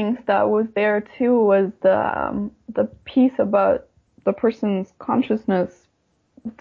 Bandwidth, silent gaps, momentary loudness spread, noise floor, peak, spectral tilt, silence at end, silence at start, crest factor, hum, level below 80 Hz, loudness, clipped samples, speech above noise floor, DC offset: 6.6 kHz; none; 8 LU; -67 dBFS; -6 dBFS; -9 dB/octave; 0.1 s; 0 s; 14 dB; none; -56 dBFS; -21 LUFS; under 0.1%; 47 dB; under 0.1%